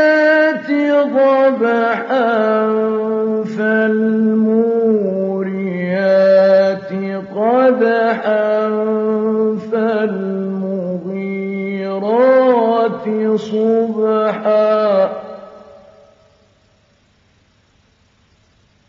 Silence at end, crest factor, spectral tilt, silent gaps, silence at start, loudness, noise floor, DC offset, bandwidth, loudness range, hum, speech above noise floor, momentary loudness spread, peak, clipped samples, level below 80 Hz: 3.3 s; 14 dB; -5 dB/octave; none; 0 s; -15 LUFS; -55 dBFS; under 0.1%; 7.2 kHz; 5 LU; none; 42 dB; 10 LU; -2 dBFS; under 0.1%; -66 dBFS